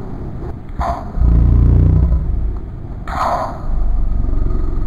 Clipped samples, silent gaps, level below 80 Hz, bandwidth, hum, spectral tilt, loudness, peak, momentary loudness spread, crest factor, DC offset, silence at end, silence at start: under 0.1%; none; -16 dBFS; 7.2 kHz; none; -9 dB/octave; -17 LUFS; -2 dBFS; 16 LU; 12 dB; under 0.1%; 0 s; 0 s